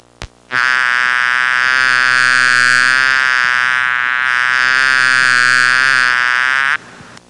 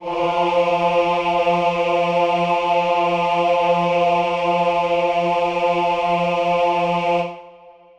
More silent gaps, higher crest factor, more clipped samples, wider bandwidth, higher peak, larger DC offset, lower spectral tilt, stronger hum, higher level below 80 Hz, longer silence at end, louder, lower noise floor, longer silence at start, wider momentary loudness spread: neither; about the same, 12 dB vs 12 dB; neither; first, 11.5 kHz vs 9 kHz; first, -2 dBFS vs -6 dBFS; neither; second, 0 dB/octave vs -6 dB/octave; neither; about the same, -50 dBFS vs -54 dBFS; second, 0.1 s vs 0.25 s; first, -11 LUFS vs -18 LUFS; second, -37 dBFS vs -45 dBFS; first, 0.2 s vs 0 s; about the same, 4 LU vs 2 LU